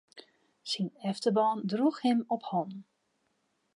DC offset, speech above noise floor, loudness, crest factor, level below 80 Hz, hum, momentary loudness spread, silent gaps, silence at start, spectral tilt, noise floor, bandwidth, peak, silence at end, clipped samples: under 0.1%; 46 dB; -31 LUFS; 18 dB; -88 dBFS; none; 12 LU; none; 0.15 s; -6 dB/octave; -76 dBFS; 11.5 kHz; -14 dBFS; 0.95 s; under 0.1%